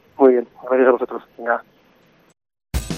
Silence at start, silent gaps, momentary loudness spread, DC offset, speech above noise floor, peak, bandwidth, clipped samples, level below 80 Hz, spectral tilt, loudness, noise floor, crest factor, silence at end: 0.2 s; none; 14 LU; under 0.1%; 35 dB; -2 dBFS; 14.5 kHz; under 0.1%; -38 dBFS; -6 dB/octave; -19 LUFS; -55 dBFS; 18 dB; 0 s